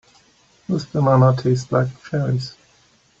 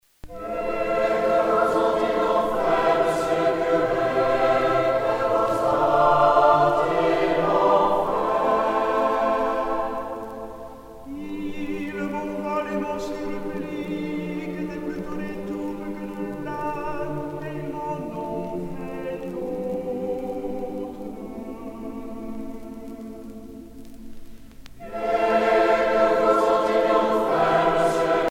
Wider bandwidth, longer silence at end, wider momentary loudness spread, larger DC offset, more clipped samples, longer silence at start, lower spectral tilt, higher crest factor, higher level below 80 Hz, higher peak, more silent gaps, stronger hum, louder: second, 7.6 kHz vs 16 kHz; first, 0.7 s vs 0 s; second, 11 LU vs 16 LU; neither; neither; first, 0.7 s vs 0.25 s; first, -8 dB/octave vs -6 dB/octave; about the same, 18 dB vs 18 dB; second, -54 dBFS vs -48 dBFS; about the same, -4 dBFS vs -4 dBFS; neither; second, none vs 50 Hz at -55 dBFS; first, -19 LUFS vs -23 LUFS